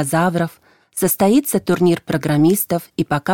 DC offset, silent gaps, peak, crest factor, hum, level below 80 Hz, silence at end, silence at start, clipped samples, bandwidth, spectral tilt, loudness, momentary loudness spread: under 0.1%; none; -4 dBFS; 14 dB; none; -52 dBFS; 0 s; 0 s; under 0.1%; 17.5 kHz; -5.5 dB/octave; -17 LUFS; 7 LU